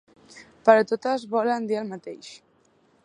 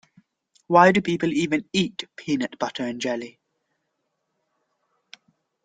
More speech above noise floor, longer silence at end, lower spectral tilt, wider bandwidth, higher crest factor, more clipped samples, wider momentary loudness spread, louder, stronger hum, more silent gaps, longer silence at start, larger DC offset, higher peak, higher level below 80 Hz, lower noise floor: second, 39 dB vs 55 dB; second, 0.7 s vs 2.35 s; about the same, -5 dB/octave vs -5 dB/octave; about the same, 10 kHz vs 9.4 kHz; about the same, 24 dB vs 24 dB; neither; first, 21 LU vs 13 LU; about the same, -23 LUFS vs -22 LUFS; neither; neither; second, 0.35 s vs 0.7 s; neither; about the same, -2 dBFS vs -2 dBFS; second, -76 dBFS vs -64 dBFS; second, -62 dBFS vs -77 dBFS